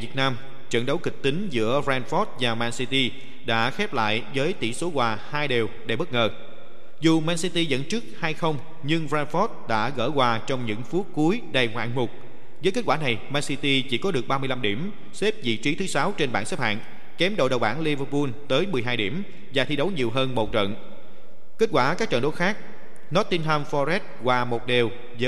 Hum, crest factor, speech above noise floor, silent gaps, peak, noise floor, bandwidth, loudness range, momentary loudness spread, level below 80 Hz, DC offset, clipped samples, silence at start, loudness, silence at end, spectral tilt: none; 20 dB; 27 dB; none; -6 dBFS; -52 dBFS; 14.5 kHz; 1 LU; 6 LU; -58 dBFS; 5%; under 0.1%; 0 s; -25 LUFS; 0 s; -5 dB/octave